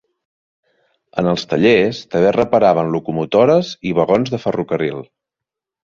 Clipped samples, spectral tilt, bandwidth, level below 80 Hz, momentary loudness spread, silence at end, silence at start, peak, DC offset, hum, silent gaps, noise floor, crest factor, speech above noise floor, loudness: under 0.1%; -6.5 dB/octave; 7.4 kHz; -52 dBFS; 8 LU; 0.8 s; 1.15 s; 0 dBFS; under 0.1%; none; none; -85 dBFS; 16 dB; 70 dB; -16 LUFS